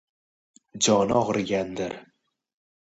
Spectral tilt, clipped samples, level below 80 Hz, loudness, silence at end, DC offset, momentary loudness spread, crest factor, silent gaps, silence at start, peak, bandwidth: -4 dB/octave; under 0.1%; -58 dBFS; -24 LUFS; 0.85 s; under 0.1%; 13 LU; 20 dB; none; 0.75 s; -6 dBFS; 8.8 kHz